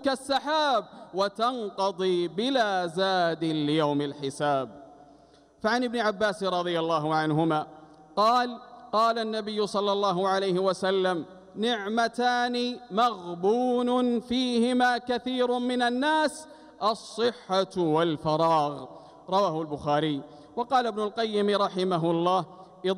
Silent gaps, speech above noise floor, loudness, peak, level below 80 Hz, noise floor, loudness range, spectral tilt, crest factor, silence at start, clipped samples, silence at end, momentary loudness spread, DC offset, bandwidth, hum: none; 31 dB; -27 LUFS; -12 dBFS; -66 dBFS; -57 dBFS; 2 LU; -5 dB/octave; 14 dB; 0 s; under 0.1%; 0 s; 6 LU; under 0.1%; 13.5 kHz; none